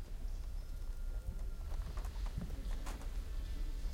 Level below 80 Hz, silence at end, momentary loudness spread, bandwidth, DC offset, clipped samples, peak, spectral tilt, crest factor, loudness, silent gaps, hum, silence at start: -40 dBFS; 0 s; 4 LU; 15.5 kHz; under 0.1%; under 0.1%; -30 dBFS; -5.5 dB/octave; 12 dB; -46 LUFS; none; none; 0 s